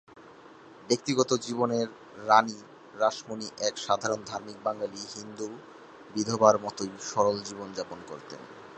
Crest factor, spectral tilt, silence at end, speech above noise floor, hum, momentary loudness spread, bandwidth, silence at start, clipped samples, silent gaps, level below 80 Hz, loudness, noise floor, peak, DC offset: 24 dB; -4 dB/octave; 0 s; 22 dB; none; 20 LU; 9.2 kHz; 0.15 s; under 0.1%; none; -70 dBFS; -29 LUFS; -51 dBFS; -6 dBFS; under 0.1%